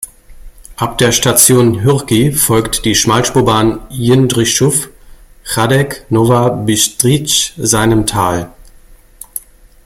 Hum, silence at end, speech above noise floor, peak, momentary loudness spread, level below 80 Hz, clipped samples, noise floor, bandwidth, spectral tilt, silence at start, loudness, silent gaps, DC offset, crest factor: none; 0.45 s; 29 dB; 0 dBFS; 12 LU; -36 dBFS; under 0.1%; -40 dBFS; 17 kHz; -4 dB/octave; 0 s; -11 LUFS; none; under 0.1%; 12 dB